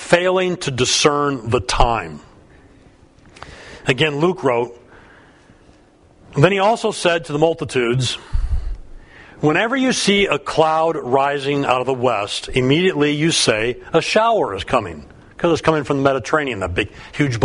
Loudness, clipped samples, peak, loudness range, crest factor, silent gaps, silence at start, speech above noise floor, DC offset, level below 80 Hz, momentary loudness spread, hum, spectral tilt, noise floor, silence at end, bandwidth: -18 LUFS; under 0.1%; 0 dBFS; 5 LU; 18 dB; none; 0 s; 33 dB; under 0.1%; -32 dBFS; 10 LU; none; -4.5 dB/octave; -50 dBFS; 0 s; 11 kHz